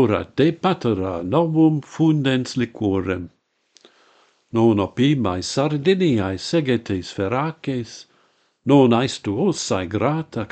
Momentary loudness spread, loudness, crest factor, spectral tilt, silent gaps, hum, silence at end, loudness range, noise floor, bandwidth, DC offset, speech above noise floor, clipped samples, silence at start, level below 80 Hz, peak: 10 LU; -20 LUFS; 18 dB; -6.5 dB/octave; none; none; 0.05 s; 2 LU; -62 dBFS; 9 kHz; under 0.1%; 42 dB; under 0.1%; 0 s; -54 dBFS; -2 dBFS